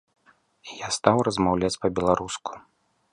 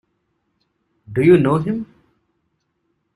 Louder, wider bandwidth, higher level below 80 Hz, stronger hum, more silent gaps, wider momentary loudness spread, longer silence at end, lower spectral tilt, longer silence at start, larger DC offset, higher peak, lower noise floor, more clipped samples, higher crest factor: second, -24 LUFS vs -17 LUFS; about the same, 11.5 kHz vs 11.5 kHz; about the same, -50 dBFS vs -54 dBFS; neither; neither; first, 19 LU vs 14 LU; second, 0.55 s vs 1.3 s; second, -5 dB/octave vs -9 dB/octave; second, 0.65 s vs 1.1 s; neither; about the same, -2 dBFS vs -2 dBFS; second, -57 dBFS vs -70 dBFS; neither; first, 24 dB vs 18 dB